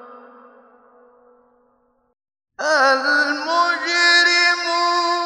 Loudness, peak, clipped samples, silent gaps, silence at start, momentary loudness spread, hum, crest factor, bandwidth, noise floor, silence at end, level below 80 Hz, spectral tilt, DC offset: -16 LUFS; -2 dBFS; under 0.1%; none; 0 s; 7 LU; none; 18 dB; 10 kHz; -62 dBFS; 0 s; -74 dBFS; 1 dB/octave; under 0.1%